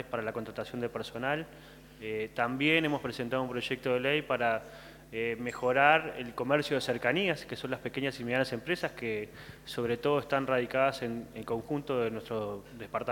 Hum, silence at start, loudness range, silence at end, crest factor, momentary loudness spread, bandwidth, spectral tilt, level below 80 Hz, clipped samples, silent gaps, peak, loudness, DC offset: none; 0 s; 3 LU; 0 s; 24 dB; 12 LU; 18 kHz; -5.5 dB/octave; -62 dBFS; under 0.1%; none; -8 dBFS; -32 LUFS; under 0.1%